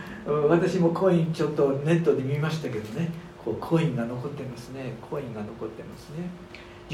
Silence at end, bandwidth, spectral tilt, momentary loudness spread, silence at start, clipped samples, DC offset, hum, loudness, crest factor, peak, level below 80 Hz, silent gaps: 0 s; 13 kHz; -7.5 dB/octave; 15 LU; 0 s; under 0.1%; under 0.1%; none; -27 LUFS; 20 dB; -8 dBFS; -56 dBFS; none